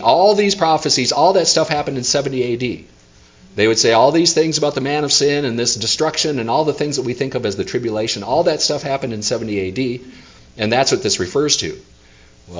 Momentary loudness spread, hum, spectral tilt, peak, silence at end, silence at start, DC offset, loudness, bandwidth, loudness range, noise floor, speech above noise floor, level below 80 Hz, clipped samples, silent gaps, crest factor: 9 LU; none; -3 dB/octave; 0 dBFS; 0 s; 0 s; under 0.1%; -16 LUFS; 7.8 kHz; 4 LU; -46 dBFS; 30 dB; -48 dBFS; under 0.1%; none; 16 dB